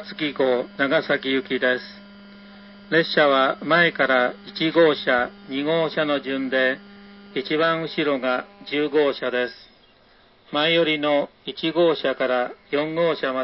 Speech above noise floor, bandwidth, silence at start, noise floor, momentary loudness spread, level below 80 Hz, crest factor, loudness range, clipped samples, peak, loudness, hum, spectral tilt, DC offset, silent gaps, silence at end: 34 dB; 5.8 kHz; 0 s; -55 dBFS; 10 LU; -64 dBFS; 18 dB; 4 LU; under 0.1%; -6 dBFS; -22 LUFS; none; -9.5 dB/octave; under 0.1%; none; 0 s